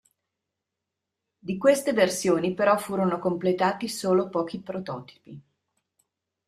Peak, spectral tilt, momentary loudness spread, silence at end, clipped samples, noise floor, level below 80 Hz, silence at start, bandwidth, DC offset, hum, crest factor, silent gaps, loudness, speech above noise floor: -8 dBFS; -5 dB/octave; 13 LU; 1.05 s; under 0.1%; -85 dBFS; -68 dBFS; 1.45 s; 15 kHz; under 0.1%; none; 20 dB; none; -25 LUFS; 60 dB